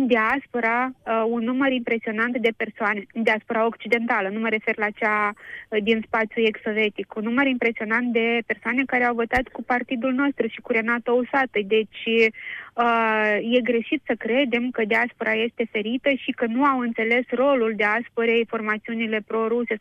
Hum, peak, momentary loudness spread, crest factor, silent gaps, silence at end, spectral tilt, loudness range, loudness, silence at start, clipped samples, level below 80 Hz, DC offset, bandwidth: none; -6 dBFS; 5 LU; 16 dB; none; 0 s; -6 dB/octave; 2 LU; -22 LUFS; 0 s; under 0.1%; -56 dBFS; under 0.1%; 8 kHz